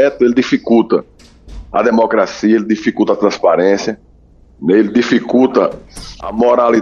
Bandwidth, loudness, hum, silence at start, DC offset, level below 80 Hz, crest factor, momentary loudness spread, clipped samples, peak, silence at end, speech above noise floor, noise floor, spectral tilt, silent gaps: 11 kHz; -13 LUFS; none; 0 s; under 0.1%; -42 dBFS; 12 dB; 10 LU; under 0.1%; 0 dBFS; 0 s; 32 dB; -45 dBFS; -6 dB/octave; none